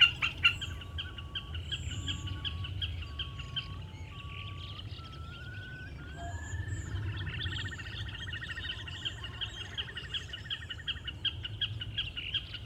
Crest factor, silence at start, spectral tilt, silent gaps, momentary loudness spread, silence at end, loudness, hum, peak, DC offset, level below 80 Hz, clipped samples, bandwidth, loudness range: 26 dB; 0 s; -3.5 dB/octave; none; 10 LU; 0 s; -36 LUFS; none; -10 dBFS; under 0.1%; -48 dBFS; under 0.1%; 16 kHz; 6 LU